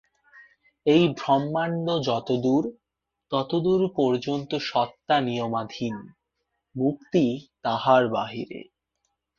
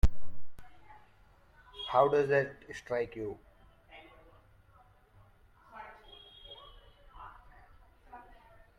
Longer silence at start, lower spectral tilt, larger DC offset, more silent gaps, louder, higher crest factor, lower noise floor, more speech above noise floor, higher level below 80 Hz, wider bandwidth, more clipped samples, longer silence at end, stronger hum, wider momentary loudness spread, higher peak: first, 0.35 s vs 0.05 s; about the same, -7 dB/octave vs -6 dB/octave; neither; neither; first, -25 LUFS vs -32 LUFS; about the same, 20 dB vs 22 dB; first, -79 dBFS vs -62 dBFS; first, 55 dB vs 32 dB; second, -64 dBFS vs -44 dBFS; second, 7.2 kHz vs 11 kHz; neither; first, 0.75 s vs 0.6 s; neither; second, 12 LU vs 29 LU; first, -6 dBFS vs -12 dBFS